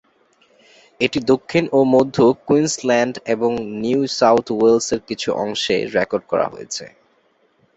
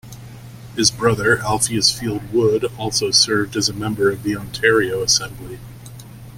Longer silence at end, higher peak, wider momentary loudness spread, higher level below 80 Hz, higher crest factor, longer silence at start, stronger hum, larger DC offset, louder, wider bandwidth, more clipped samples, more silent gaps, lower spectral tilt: first, 0.9 s vs 0 s; about the same, -2 dBFS vs 0 dBFS; second, 8 LU vs 22 LU; second, -56 dBFS vs -44 dBFS; about the same, 16 dB vs 18 dB; first, 1 s vs 0.05 s; neither; neither; about the same, -18 LUFS vs -17 LUFS; second, 8.2 kHz vs 16.5 kHz; neither; neither; first, -4.5 dB/octave vs -3 dB/octave